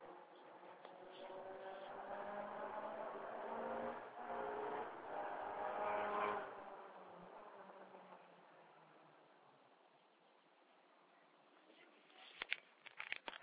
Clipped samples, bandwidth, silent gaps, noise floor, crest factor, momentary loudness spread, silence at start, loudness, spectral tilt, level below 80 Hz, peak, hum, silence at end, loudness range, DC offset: under 0.1%; 4 kHz; none; -72 dBFS; 30 dB; 23 LU; 0 s; -48 LUFS; -1 dB/octave; -86 dBFS; -20 dBFS; none; 0 s; 22 LU; under 0.1%